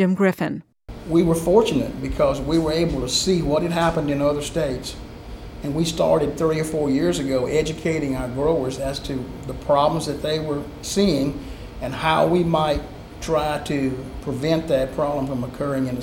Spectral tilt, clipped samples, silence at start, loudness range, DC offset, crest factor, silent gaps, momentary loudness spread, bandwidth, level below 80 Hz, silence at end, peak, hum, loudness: -5.5 dB/octave; under 0.1%; 0 s; 3 LU; under 0.1%; 18 dB; none; 12 LU; 17 kHz; -38 dBFS; 0 s; -4 dBFS; none; -22 LUFS